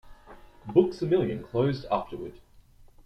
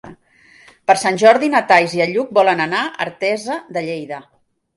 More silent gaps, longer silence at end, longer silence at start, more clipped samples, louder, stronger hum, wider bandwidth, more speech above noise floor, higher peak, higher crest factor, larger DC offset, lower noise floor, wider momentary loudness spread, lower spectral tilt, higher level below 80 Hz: neither; first, 0.7 s vs 0.55 s; about the same, 0.05 s vs 0.05 s; neither; second, -27 LUFS vs -16 LUFS; neither; second, 8.2 kHz vs 11.5 kHz; second, 28 dB vs 34 dB; second, -8 dBFS vs 0 dBFS; about the same, 20 dB vs 18 dB; neither; first, -54 dBFS vs -50 dBFS; first, 16 LU vs 13 LU; first, -8.5 dB/octave vs -4 dB/octave; first, -54 dBFS vs -62 dBFS